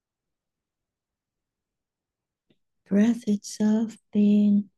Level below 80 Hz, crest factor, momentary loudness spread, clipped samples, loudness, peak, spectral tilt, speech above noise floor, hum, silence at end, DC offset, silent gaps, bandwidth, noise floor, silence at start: -72 dBFS; 14 dB; 8 LU; under 0.1%; -23 LUFS; -12 dBFS; -7 dB/octave; 66 dB; none; 0.15 s; under 0.1%; none; 10 kHz; -88 dBFS; 2.9 s